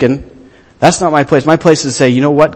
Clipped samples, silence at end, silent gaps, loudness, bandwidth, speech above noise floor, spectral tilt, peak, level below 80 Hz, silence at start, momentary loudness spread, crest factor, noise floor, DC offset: 0.7%; 0 s; none; -10 LUFS; 12 kHz; 30 dB; -5 dB/octave; 0 dBFS; -42 dBFS; 0 s; 3 LU; 10 dB; -40 dBFS; under 0.1%